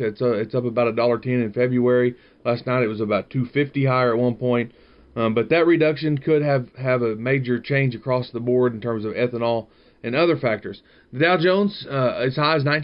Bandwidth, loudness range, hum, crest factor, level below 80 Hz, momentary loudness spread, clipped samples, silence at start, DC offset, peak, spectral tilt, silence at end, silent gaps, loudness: 5.6 kHz; 2 LU; none; 16 dB; -58 dBFS; 7 LU; under 0.1%; 0 s; under 0.1%; -6 dBFS; -10.5 dB/octave; 0 s; none; -21 LUFS